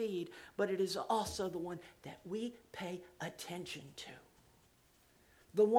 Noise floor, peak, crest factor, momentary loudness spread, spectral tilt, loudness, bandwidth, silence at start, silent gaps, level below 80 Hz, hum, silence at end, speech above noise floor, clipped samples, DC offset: -69 dBFS; -16 dBFS; 22 dB; 15 LU; -4.5 dB/octave; -41 LUFS; 17.5 kHz; 0 s; none; -68 dBFS; none; 0 s; 28 dB; under 0.1%; under 0.1%